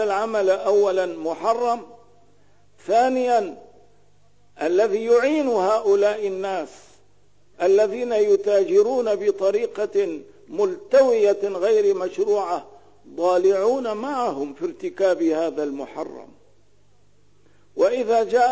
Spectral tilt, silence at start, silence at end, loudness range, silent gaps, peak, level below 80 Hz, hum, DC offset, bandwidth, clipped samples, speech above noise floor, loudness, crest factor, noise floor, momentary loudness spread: -4.5 dB/octave; 0 s; 0 s; 5 LU; none; -8 dBFS; -66 dBFS; 50 Hz at -65 dBFS; 0.3%; 8 kHz; under 0.1%; 41 dB; -21 LUFS; 14 dB; -61 dBFS; 11 LU